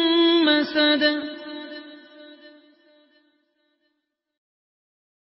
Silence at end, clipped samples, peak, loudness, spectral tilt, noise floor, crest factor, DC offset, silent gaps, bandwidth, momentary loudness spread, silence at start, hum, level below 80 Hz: 2.9 s; under 0.1%; -6 dBFS; -19 LUFS; -6.5 dB/octave; -78 dBFS; 18 dB; under 0.1%; none; 5.8 kHz; 20 LU; 0 s; none; -72 dBFS